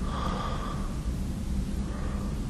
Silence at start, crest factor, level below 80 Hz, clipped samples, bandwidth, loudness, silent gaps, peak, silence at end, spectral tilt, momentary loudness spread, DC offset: 0 s; 14 dB; -34 dBFS; under 0.1%; 13 kHz; -33 LUFS; none; -18 dBFS; 0 s; -6.5 dB/octave; 2 LU; under 0.1%